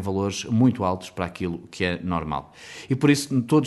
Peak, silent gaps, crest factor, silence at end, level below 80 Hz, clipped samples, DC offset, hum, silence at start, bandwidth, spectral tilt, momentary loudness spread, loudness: -6 dBFS; none; 18 dB; 0 s; -50 dBFS; under 0.1%; under 0.1%; none; 0 s; 12 kHz; -6 dB/octave; 11 LU; -24 LUFS